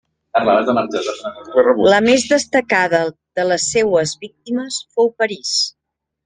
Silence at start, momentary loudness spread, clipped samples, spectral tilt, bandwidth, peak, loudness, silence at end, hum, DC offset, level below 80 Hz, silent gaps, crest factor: 0.35 s; 11 LU; under 0.1%; -3 dB/octave; 10 kHz; -2 dBFS; -16 LUFS; 0.55 s; none; under 0.1%; -56 dBFS; none; 16 dB